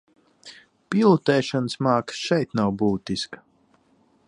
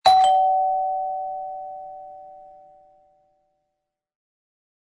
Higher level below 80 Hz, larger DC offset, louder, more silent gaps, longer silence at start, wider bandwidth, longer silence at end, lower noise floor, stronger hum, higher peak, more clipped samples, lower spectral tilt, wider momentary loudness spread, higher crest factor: first, -58 dBFS vs -64 dBFS; neither; about the same, -23 LUFS vs -21 LUFS; neither; first, 0.45 s vs 0.05 s; about the same, 11 kHz vs 11 kHz; second, 0.9 s vs 2.5 s; second, -62 dBFS vs -81 dBFS; neither; about the same, -4 dBFS vs -4 dBFS; neither; first, -6 dB/octave vs -1 dB/octave; second, 11 LU vs 25 LU; about the same, 20 dB vs 20 dB